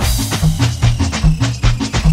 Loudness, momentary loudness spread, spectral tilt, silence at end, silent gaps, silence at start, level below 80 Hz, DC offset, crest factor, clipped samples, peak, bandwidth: -16 LUFS; 1 LU; -5 dB/octave; 0 s; none; 0 s; -18 dBFS; under 0.1%; 12 dB; under 0.1%; 0 dBFS; 16.5 kHz